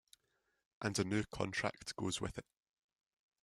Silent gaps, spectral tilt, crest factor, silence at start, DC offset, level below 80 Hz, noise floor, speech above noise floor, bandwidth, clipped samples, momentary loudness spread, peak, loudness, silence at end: none; -4.5 dB/octave; 24 dB; 0.8 s; under 0.1%; -64 dBFS; -83 dBFS; 43 dB; 14 kHz; under 0.1%; 7 LU; -20 dBFS; -40 LUFS; 1 s